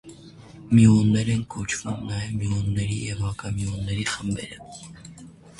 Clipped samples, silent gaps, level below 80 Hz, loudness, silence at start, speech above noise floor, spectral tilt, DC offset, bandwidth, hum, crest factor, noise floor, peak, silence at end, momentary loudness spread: under 0.1%; none; -44 dBFS; -24 LUFS; 0.05 s; 22 dB; -6 dB/octave; under 0.1%; 11.5 kHz; none; 18 dB; -45 dBFS; -6 dBFS; 0.3 s; 23 LU